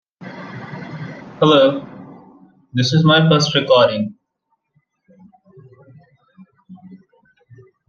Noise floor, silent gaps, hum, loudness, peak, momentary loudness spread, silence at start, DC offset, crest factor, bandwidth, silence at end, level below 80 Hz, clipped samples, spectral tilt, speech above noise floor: -71 dBFS; none; none; -15 LUFS; -2 dBFS; 21 LU; 0.2 s; under 0.1%; 18 dB; 7.2 kHz; 0.95 s; -60 dBFS; under 0.1%; -5.5 dB/octave; 57 dB